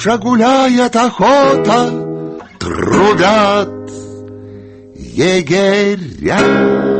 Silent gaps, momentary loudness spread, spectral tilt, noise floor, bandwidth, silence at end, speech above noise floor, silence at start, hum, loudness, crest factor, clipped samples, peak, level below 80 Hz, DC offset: none; 18 LU; -5 dB/octave; -33 dBFS; 8.8 kHz; 0 s; 22 dB; 0 s; none; -12 LUFS; 12 dB; under 0.1%; 0 dBFS; -42 dBFS; under 0.1%